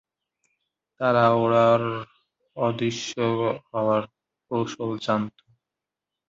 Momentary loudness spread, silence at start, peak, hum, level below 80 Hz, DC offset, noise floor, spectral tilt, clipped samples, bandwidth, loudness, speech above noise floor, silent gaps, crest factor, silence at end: 15 LU; 1 s; -6 dBFS; none; -64 dBFS; under 0.1%; -87 dBFS; -6 dB/octave; under 0.1%; 7.8 kHz; -24 LUFS; 64 dB; none; 20 dB; 1 s